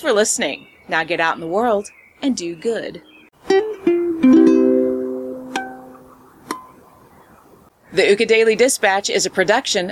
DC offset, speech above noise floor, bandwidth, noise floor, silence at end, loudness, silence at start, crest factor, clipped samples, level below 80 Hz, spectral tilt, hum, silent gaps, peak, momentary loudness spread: under 0.1%; 32 dB; 15 kHz; -49 dBFS; 0 s; -17 LUFS; 0 s; 16 dB; under 0.1%; -58 dBFS; -3 dB/octave; none; none; -2 dBFS; 16 LU